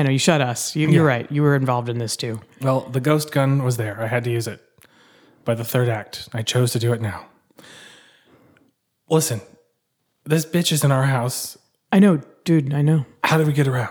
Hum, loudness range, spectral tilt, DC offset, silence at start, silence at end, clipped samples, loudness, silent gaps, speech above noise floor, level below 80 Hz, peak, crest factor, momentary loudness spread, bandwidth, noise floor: none; 7 LU; -5.5 dB/octave; under 0.1%; 0 s; 0 s; under 0.1%; -20 LUFS; none; 53 dB; -64 dBFS; -2 dBFS; 18 dB; 10 LU; over 20 kHz; -72 dBFS